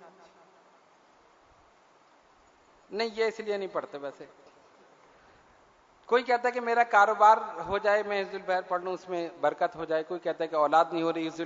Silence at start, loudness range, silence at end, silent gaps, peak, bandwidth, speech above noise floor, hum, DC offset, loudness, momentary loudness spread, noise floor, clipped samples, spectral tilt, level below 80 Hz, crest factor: 0 s; 11 LU; 0 s; none; -8 dBFS; 7.8 kHz; 34 dB; none; under 0.1%; -27 LUFS; 13 LU; -61 dBFS; under 0.1%; -4.5 dB/octave; -68 dBFS; 20 dB